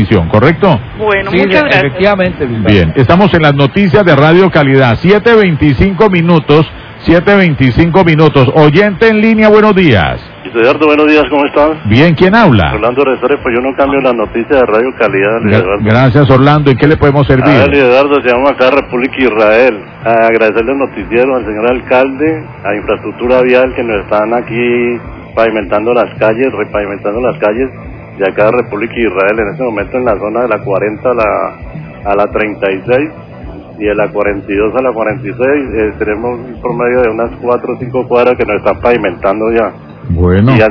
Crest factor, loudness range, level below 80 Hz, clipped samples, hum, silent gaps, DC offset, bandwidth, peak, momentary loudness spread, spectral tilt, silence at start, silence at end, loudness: 8 dB; 6 LU; -30 dBFS; 3%; none; none; under 0.1%; 5.4 kHz; 0 dBFS; 9 LU; -8.5 dB/octave; 0 s; 0 s; -9 LUFS